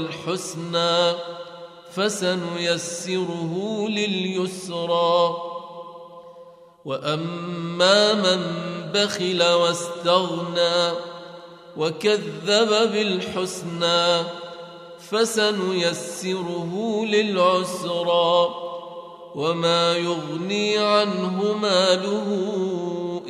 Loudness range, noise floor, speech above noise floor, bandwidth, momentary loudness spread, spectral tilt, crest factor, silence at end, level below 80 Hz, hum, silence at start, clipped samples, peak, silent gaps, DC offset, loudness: 4 LU; -46 dBFS; 24 dB; 14 kHz; 17 LU; -4 dB/octave; 18 dB; 0 s; -70 dBFS; none; 0 s; under 0.1%; -4 dBFS; none; under 0.1%; -22 LUFS